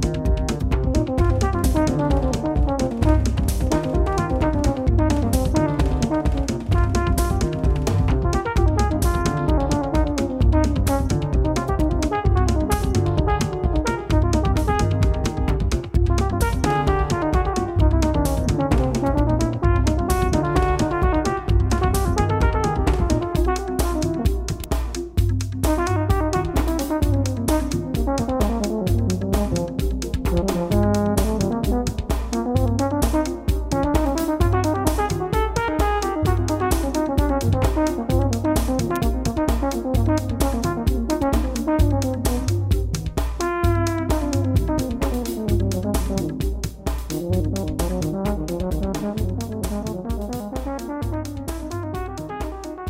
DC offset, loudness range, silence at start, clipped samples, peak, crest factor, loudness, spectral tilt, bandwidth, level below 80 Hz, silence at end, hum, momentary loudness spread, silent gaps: under 0.1%; 4 LU; 0 s; under 0.1%; -4 dBFS; 16 dB; -22 LUFS; -6.5 dB/octave; 16 kHz; -24 dBFS; 0 s; none; 6 LU; none